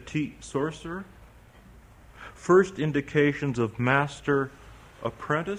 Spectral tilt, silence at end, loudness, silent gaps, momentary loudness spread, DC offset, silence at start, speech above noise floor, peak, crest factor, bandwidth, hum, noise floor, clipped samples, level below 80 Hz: -6.5 dB/octave; 0 s; -26 LUFS; none; 16 LU; under 0.1%; 0 s; 26 dB; -8 dBFS; 20 dB; 11 kHz; none; -52 dBFS; under 0.1%; -54 dBFS